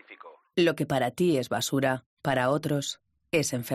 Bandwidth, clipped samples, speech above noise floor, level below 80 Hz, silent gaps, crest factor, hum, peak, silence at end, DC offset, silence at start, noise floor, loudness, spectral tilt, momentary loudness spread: 15 kHz; under 0.1%; 24 dB; -66 dBFS; 2.06-2.17 s; 16 dB; none; -12 dBFS; 0 s; under 0.1%; 0.1 s; -50 dBFS; -27 LUFS; -5 dB/octave; 6 LU